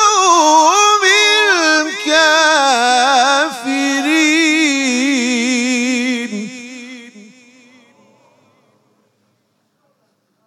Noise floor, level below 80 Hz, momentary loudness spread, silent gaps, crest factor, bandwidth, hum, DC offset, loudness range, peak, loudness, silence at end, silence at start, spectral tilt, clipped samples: -63 dBFS; -72 dBFS; 12 LU; none; 14 dB; 15.5 kHz; none; under 0.1%; 12 LU; 0 dBFS; -12 LUFS; 3.25 s; 0 s; -0.5 dB/octave; under 0.1%